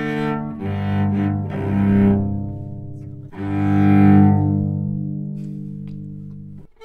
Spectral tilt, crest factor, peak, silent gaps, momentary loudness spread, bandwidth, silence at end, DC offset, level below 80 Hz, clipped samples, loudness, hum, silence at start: -10.5 dB/octave; 16 dB; -2 dBFS; none; 21 LU; 4.3 kHz; 0 s; under 0.1%; -44 dBFS; under 0.1%; -19 LUFS; 50 Hz at -25 dBFS; 0 s